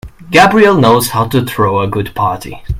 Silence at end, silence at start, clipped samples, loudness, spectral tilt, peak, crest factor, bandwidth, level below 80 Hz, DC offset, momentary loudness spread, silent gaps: 0 s; 0.05 s; 0.5%; -11 LUFS; -5.5 dB/octave; 0 dBFS; 12 dB; 16.5 kHz; -34 dBFS; under 0.1%; 10 LU; none